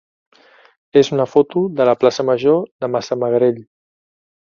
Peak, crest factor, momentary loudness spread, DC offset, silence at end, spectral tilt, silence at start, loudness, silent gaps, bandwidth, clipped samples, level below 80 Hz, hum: 0 dBFS; 18 dB; 6 LU; under 0.1%; 1 s; -6.5 dB/octave; 0.95 s; -16 LUFS; 2.71-2.79 s; 7.2 kHz; under 0.1%; -62 dBFS; none